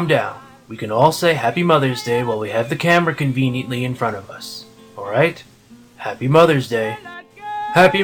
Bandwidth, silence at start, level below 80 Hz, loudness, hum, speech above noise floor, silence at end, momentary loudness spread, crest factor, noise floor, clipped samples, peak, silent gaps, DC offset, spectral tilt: 18 kHz; 0 s; -56 dBFS; -17 LUFS; none; 27 dB; 0 s; 19 LU; 18 dB; -44 dBFS; under 0.1%; 0 dBFS; none; under 0.1%; -6 dB/octave